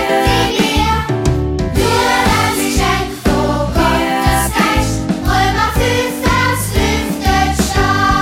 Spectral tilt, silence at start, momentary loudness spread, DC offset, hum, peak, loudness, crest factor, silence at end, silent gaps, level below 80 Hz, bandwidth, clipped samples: -4.5 dB/octave; 0 s; 4 LU; under 0.1%; none; 0 dBFS; -14 LUFS; 12 dB; 0 s; none; -22 dBFS; 16.5 kHz; under 0.1%